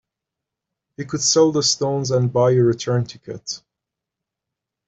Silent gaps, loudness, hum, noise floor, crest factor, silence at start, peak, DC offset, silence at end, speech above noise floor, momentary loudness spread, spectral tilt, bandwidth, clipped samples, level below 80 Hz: none; -18 LUFS; none; -84 dBFS; 18 dB; 1 s; -2 dBFS; under 0.1%; 1.3 s; 65 dB; 16 LU; -4.5 dB/octave; 8.2 kHz; under 0.1%; -58 dBFS